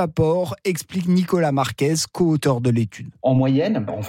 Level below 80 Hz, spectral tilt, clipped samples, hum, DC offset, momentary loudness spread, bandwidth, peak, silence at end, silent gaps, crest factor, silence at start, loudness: -50 dBFS; -6 dB/octave; under 0.1%; none; under 0.1%; 6 LU; 16.5 kHz; -6 dBFS; 0 s; none; 14 dB; 0 s; -20 LUFS